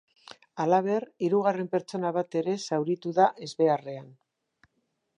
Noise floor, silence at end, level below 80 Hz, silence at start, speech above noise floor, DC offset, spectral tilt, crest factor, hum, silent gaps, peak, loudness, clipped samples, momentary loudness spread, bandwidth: -77 dBFS; 1.05 s; -82 dBFS; 0.55 s; 50 dB; under 0.1%; -6.5 dB/octave; 20 dB; none; none; -8 dBFS; -27 LUFS; under 0.1%; 7 LU; 10.5 kHz